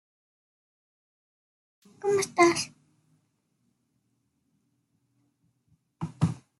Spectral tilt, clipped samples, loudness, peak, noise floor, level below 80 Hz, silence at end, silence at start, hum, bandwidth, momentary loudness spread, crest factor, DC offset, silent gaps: -5 dB/octave; under 0.1%; -26 LUFS; -8 dBFS; -75 dBFS; -68 dBFS; 0.25 s; 2.05 s; none; 12.5 kHz; 17 LU; 24 dB; under 0.1%; none